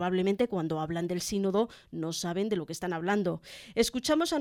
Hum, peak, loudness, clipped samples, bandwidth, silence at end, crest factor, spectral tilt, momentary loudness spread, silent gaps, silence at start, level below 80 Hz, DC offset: none; -12 dBFS; -31 LUFS; under 0.1%; 17 kHz; 0 s; 18 dB; -5 dB/octave; 7 LU; none; 0 s; -58 dBFS; under 0.1%